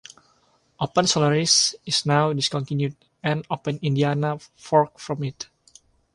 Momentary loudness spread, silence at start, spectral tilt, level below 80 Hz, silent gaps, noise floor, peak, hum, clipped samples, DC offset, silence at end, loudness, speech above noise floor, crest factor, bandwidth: 12 LU; 0.8 s; -4 dB/octave; -62 dBFS; none; -63 dBFS; -4 dBFS; none; under 0.1%; under 0.1%; 0.7 s; -22 LUFS; 40 dB; 20 dB; 11.5 kHz